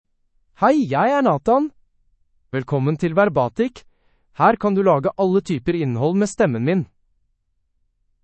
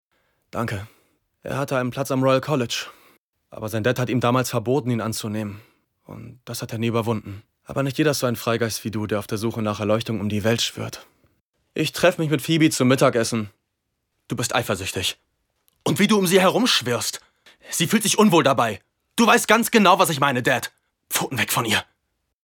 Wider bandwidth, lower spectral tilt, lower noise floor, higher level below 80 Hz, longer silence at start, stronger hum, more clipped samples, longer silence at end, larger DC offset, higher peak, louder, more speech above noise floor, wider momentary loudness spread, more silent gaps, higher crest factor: second, 8.8 kHz vs 19 kHz; first, -7.5 dB/octave vs -4 dB/octave; second, -68 dBFS vs -77 dBFS; first, -52 dBFS vs -60 dBFS; about the same, 0.6 s vs 0.55 s; neither; neither; first, 1.4 s vs 0.65 s; neither; about the same, -2 dBFS vs -4 dBFS; about the same, -19 LUFS vs -21 LUFS; second, 50 dB vs 56 dB; second, 7 LU vs 17 LU; second, none vs 3.18-3.33 s, 11.41-11.53 s; about the same, 18 dB vs 20 dB